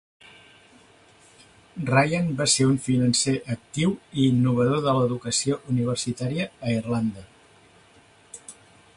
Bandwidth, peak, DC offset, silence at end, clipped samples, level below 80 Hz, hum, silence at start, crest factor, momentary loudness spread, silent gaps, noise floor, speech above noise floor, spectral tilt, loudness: 11.5 kHz; -6 dBFS; under 0.1%; 0.45 s; under 0.1%; -56 dBFS; none; 1.75 s; 20 dB; 20 LU; none; -55 dBFS; 32 dB; -5 dB/octave; -23 LUFS